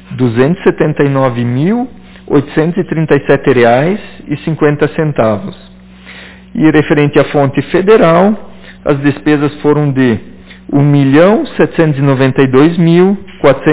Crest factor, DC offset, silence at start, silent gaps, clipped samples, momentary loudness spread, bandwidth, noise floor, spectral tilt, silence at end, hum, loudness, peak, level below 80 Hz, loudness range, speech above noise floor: 10 dB; under 0.1%; 0.1 s; none; 0.6%; 10 LU; 4 kHz; -33 dBFS; -11.5 dB/octave; 0 s; none; -10 LUFS; 0 dBFS; -40 dBFS; 3 LU; 24 dB